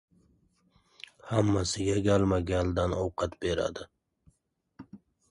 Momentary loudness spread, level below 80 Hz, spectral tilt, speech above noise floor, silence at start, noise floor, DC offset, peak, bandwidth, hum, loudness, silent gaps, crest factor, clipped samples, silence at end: 23 LU; -46 dBFS; -6 dB/octave; 47 dB; 1.25 s; -75 dBFS; under 0.1%; -12 dBFS; 11.5 kHz; none; -29 LUFS; none; 18 dB; under 0.1%; 0.35 s